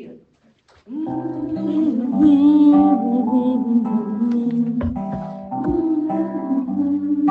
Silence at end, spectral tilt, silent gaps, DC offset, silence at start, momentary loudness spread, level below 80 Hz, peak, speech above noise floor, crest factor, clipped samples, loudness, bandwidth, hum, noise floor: 0 s; -10 dB/octave; none; under 0.1%; 0 s; 14 LU; -48 dBFS; -4 dBFS; 39 dB; 14 dB; under 0.1%; -18 LUFS; 4.1 kHz; none; -57 dBFS